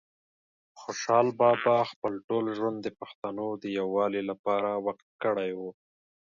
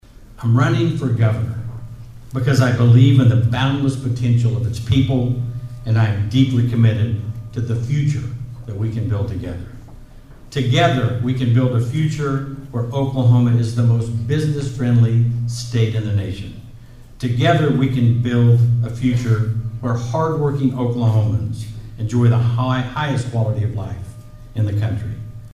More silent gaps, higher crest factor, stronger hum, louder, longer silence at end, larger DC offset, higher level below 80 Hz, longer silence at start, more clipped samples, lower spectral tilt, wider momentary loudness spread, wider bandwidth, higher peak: first, 1.96-2.02 s, 2.24-2.28 s, 3.15-3.22 s, 4.39-4.44 s, 5.02-5.19 s vs none; about the same, 20 dB vs 16 dB; neither; second, -29 LUFS vs -18 LUFS; first, 0.6 s vs 0.05 s; neither; second, -74 dBFS vs -40 dBFS; first, 0.75 s vs 0.2 s; neither; second, -5.5 dB/octave vs -7.5 dB/octave; about the same, 15 LU vs 13 LU; second, 7.4 kHz vs 10 kHz; second, -10 dBFS vs 0 dBFS